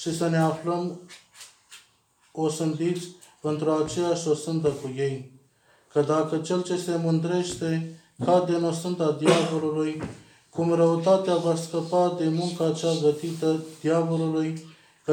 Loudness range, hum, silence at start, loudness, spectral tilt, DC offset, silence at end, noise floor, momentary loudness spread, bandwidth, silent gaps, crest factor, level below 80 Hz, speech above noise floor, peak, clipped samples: 5 LU; none; 0 s; -25 LUFS; -6 dB/octave; under 0.1%; 0 s; -64 dBFS; 12 LU; 15.5 kHz; none; 20 dB; -66 dBFS; 39 dB; -6 dBFS; under 0.1%